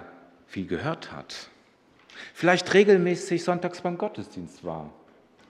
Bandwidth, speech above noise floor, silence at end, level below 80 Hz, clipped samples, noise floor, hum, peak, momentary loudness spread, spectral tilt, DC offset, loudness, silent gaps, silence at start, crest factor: 11.5 kHz; 34 dB; 0.6 s; -68 dBFS; under 0.1%; -59 dBFS; none; -6 dBFS; 21 LU; -5.5 dB/octave; under 0.1%; -25 LUFS; none; 0 s; 22 dB